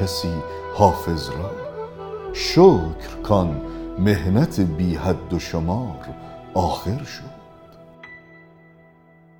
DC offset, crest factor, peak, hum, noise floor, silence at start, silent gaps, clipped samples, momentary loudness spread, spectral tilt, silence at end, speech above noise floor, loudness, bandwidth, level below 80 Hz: under 0.1%; 22 dB; 0 dBFS; none; -51 dBFS; 0 s; none; under 0.1%; 18 LU; -6.5 dB/octave; 1.05 s; 31 dB; -21 LUFS; 19 kHz; -38 dBFS